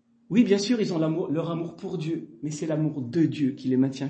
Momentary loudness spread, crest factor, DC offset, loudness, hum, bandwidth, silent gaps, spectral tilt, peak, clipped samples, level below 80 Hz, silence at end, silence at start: 10 LU; 18 dB; under 0.1%; -26 LUFS; none; 8.6 kHz; none; -6.5 dB/octave; -8 dBFS; under 0.1%; -70 dBFS; 0 s; 0.3 s